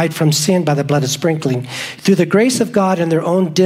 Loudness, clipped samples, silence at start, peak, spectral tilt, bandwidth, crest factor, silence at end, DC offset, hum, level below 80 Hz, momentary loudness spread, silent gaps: -15 LUFS; under 0.1%; 0 s; 0 dBFS; -5 dB/octave; 16 kHz; 14 dB; 0 s; under 0.1%; none; -58 dBFS; 6 LU; none